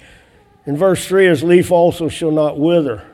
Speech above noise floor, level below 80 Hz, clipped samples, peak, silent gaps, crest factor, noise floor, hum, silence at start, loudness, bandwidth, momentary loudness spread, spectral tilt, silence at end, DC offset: 35 dB; -48 dBFS; under 0.1%; 0 dBFS; none; 14 dB; -49 dBFS; none; 0.65 s; -14 LUFS; 14.5 kHz; 8 LU; -6 dB/octave; 0.1 s; under 0.1%